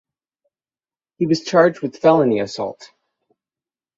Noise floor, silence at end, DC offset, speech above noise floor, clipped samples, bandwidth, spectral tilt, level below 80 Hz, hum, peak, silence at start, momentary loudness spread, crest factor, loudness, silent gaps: under -90 dBFS; 1.1 s; under 0.1%; over 73 dB; under 0.1%; 7.8 kHz; -6 dB/octave; -64 dBFS; none; -2 dBFS; 1.2 s; 11 LU; 18 dB; -18 LUFS; none